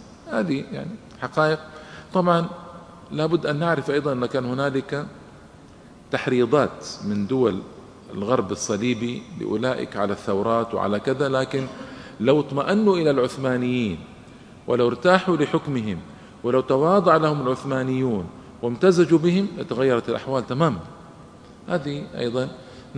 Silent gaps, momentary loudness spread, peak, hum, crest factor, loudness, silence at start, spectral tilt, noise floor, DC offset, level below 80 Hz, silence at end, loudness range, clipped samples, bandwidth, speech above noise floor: none; 15 LU; 0 dBFS; none; 22 dB; -23 LUFS; 0 s; -6.5 dB/octave; -46 dBFS; under 0.1%; -56 dBFS; 0 s; 5 LU; under 0.1%; 11 kHz; 24 dB